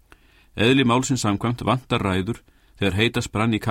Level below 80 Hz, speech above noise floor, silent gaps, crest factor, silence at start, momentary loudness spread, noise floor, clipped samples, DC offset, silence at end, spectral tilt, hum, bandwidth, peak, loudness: -46 dBFS; 32 dB; none; 18 dB; 0.55 s; 8 LU; -53 dBFS; under 0.1%; under 0.1%; 0 s; -5 dB/octave; none; 16 kHz; -4 dBFS; -22 LUFS